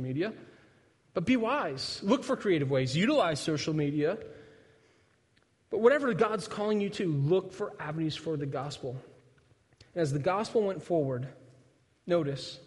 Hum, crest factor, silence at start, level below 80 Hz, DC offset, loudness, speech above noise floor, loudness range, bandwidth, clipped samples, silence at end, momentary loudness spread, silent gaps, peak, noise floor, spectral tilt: none; 20 dB; 0 s; -66 dBFS; under 0.1%; -30 LUFS; 39 dB; 4 LU; 11.5 kHz; under 0.1%; 0 s; 12 LU; none; -10 dBFS; -69 dBFS; -6 dB/octave